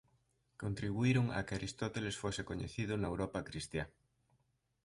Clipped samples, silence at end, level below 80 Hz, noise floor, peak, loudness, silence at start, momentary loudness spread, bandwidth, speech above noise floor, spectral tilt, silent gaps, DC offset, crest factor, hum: under 0.1%; 0.95 s; -58 dBFS; -79 dBFS; -22 dBFS; -39 LUFS; 0.6 s; 10 LU; 11.5 kHz; 41 dB; -6 dB/octave; none; under 0.1%; 18 dB; none